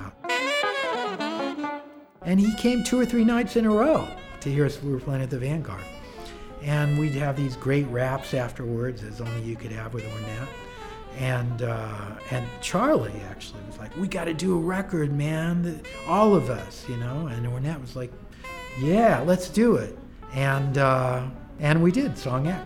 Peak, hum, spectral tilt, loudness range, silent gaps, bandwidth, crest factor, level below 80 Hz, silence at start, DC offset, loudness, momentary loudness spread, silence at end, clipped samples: -6 dBFS; none; -6.5 dB/octave; 7 LU; none; 16 kHz; 20 dB; -46 dBFS; 0 s; under 0.1%; -25 LUFS; 16 LU; 0 s; under 0.1%